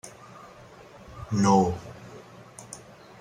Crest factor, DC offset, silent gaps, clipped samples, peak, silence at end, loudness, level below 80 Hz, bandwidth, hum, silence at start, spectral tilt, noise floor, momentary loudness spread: 22 dB; under 0.1%; none; under 0.1%; -8 dBFS; 0.45 s; -24 LUFS; -56 dBFS; 12 kHz; none; 0.05 s; -6.5 dB/octave; -49 dBFS; 27 LU